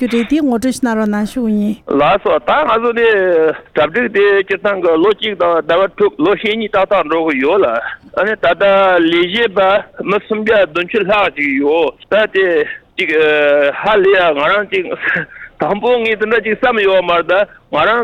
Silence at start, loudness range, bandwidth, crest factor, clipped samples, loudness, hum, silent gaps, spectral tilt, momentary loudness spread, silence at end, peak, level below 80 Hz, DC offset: 0 s; 1 LU; 14 kHz; 12 dB; under 0.1%; -13 LUFS; none; none; -5 dB/octave; 6 LU; 0 s; -2 dBFS; -46 dBFS; under 0.1%